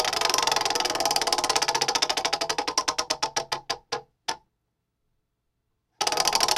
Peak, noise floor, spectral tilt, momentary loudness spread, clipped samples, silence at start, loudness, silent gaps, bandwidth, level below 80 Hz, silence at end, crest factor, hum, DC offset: -2 dBFS; -78 dBFS; 0 dB/octave; 10 LU; under 0.1%; 0 s; -25 LUFS; none; 16.5 kHz; -58 dBFS; 0 s; 26 dB; none; under 0.1%